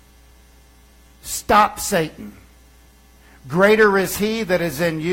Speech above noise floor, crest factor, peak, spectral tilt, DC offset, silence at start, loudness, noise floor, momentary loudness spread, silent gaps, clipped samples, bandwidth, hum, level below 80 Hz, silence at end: 32 dB; 18 dB; -4 dBFS; -4.5 dB/octave; under 0.1%; 1.25 s; -18 LUFS; -50 dBFS; 16 LU; none; under 0.1%; 16.5 kHz; none; -46 dBFS; 0 s